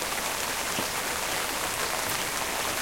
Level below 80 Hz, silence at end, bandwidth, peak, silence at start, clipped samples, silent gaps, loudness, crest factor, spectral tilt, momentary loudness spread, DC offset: -52 dBFS; 0 s; 16.5 kHz; -12 dBFS; 0 s; under 0.1%; none; -28 LUFS; 18 dB; -1 dB/octave; 1 LU; under 0.1%